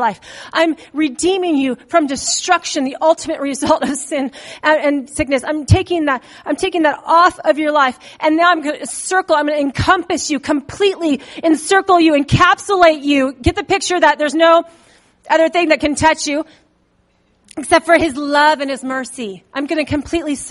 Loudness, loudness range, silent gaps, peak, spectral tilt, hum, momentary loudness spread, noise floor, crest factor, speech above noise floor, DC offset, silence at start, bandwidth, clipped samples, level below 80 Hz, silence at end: -15 LUFS; 4 LU; none; 0 dBFS; -4 dB/octave; none; 10 LU; -58 dBFS; 16 dB; 43 dB; under 0.1%; 0 s; 11.5 kHz; under 0.1%; -40 dBFS; 0 s